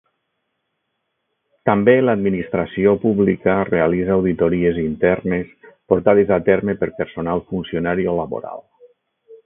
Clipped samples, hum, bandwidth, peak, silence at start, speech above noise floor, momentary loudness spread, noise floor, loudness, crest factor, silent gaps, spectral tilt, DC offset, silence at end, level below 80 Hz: under 0.1%; none; 3.8 kHz; 0 dBFS; 1.65 s; 56 dB; 10 LU; -74 dBFS; -18 LUFS; 18 dB; none; -12.5 dB/octave; under 0.1%; 0.1 s; -46 dBFS